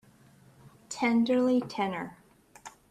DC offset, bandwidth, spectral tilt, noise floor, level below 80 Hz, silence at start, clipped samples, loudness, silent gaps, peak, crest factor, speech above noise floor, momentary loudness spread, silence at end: under 0.1%; 12 kHz; -5 dB/octave; -58 dBFS; -70 dBFS; 0.65 s; under 0.1%; -28 LUFS; none; -16 dBFS; 16 dB; 31 dB; 24 LU; 0.2 s